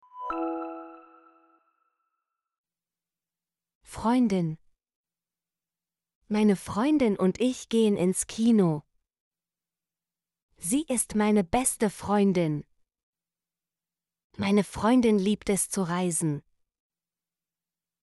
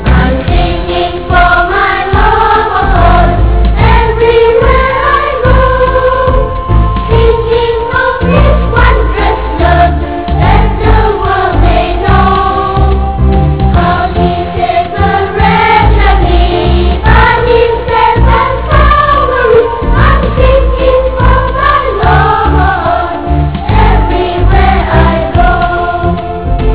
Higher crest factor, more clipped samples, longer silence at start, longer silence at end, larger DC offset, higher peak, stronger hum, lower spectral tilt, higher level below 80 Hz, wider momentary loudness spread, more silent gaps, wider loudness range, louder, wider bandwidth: first, 18 dB vs 8 dB; second, under 0.1% vs 2%; first, 0.15 s vs 0 s; first, 1.65 s vs 0 s; second, under 0.1% vs 3%; second, -12 dBFS vs 0 dBFS; neither; second, -5.5 dB/octave vs -10.5 dB/octave; second, -58 dBFS vs -12 dBFS; first, 12 LU vs 5 LU; first, 2.58-2.64 s, 3.75-3.81 s, 4.96-5.04 s, 6.15-6.21 s, 9.20-9.31 s, 10.42-10.49 s, 13.03-13.13 s, 14.24-14.30 s vs none; first, 7 LU vs 2 LU; second, -26 LUFS vs -8 LUFS; first, 12 kHz vs 4 kHz